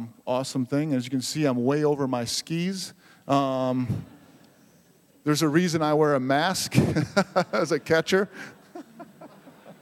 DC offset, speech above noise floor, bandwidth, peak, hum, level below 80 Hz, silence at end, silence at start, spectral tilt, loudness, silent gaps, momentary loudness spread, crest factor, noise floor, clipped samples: under 0.1%; 34 dB; 16.5 kHz; -4 dBFS; none; -60 dBFS; 0.1 s; 0 s; -5 dB/octave; -25 LUFS; none; 13 LU; 22 dB; -58 dBFS; under 0.1%